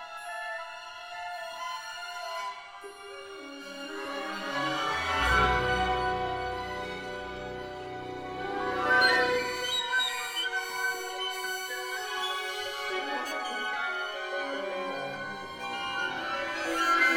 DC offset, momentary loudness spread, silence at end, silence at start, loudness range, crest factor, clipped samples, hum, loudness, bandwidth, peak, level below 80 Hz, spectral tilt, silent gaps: under 0.1%; 14 LU; 0 s; 0 s; 10 LU; 20 dB; under 0.1%; none; -31 LUFS; 19 kHz; -10 dBFS; -50 dBFS; -2.5 dB/octave; none